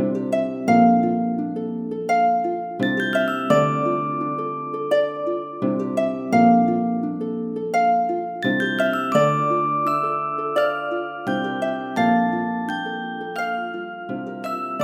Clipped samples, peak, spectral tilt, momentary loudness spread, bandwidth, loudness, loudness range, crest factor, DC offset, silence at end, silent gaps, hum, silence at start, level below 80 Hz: under 0.1%; -4 dBFS; -6.5 dB/octave; 10 LU; 15 kHz; -22 LUFS; 3 LU; 18 dB; under 0.1%; 0 s; none; none; 0 s; -70 dBFS